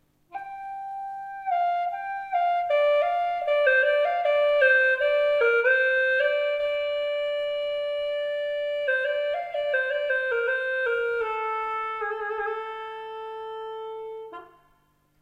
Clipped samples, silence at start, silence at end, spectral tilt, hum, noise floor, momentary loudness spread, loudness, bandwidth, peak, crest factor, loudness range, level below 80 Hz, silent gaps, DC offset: under 0.1%; 0.3 s; 0.75 s; -2 dB/octave; none; -65 dBFS; 16 LU; -24 LUFS; 7.4 kHz; -10 dBFS; 16 dB; 9 LU; -66 dBFS; none; under 0.1%